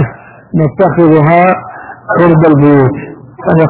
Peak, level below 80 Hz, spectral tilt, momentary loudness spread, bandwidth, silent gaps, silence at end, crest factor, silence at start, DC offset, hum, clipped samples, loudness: 0 dBFS; -40 dBFS; -12.5 dB/octave; 16 LU; 4 kHz; none; 0 s; 8 dB; 0 s; under 0.1%; none; 2%; -8 LUFS